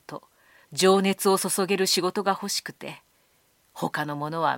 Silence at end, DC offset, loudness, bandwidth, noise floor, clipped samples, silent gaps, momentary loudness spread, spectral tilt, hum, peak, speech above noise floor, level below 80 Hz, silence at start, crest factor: 0 s; under 0.1%; -24 LUFS; 17 kHz; -65 dBFS; under 0.1%; none; 19 LU; -3.5 dB/octave; none; -6 dBFS; 40 dB; -76 dBFS; 0.1 s; 20 dB